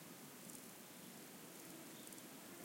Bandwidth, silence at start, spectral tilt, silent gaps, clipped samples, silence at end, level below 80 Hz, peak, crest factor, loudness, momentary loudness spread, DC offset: 17 kHz; 0 s; -3 dB/octave; none; under 0.1%; 0 s; under -90 dBFS; -38 dBFS; 20 dB; -55 LUFS; 2 LU; under 0.1%